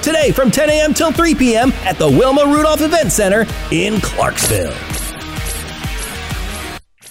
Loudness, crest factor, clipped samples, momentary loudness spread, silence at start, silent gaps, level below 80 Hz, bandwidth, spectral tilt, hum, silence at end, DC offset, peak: -14 LUFS; 12 dB; under 0.1%; 12 LU; 0 s; none; -28 dBFS; 16.5 kHz; -4 dB/octave; none; 0 s; under 0.1%; -2 dBFS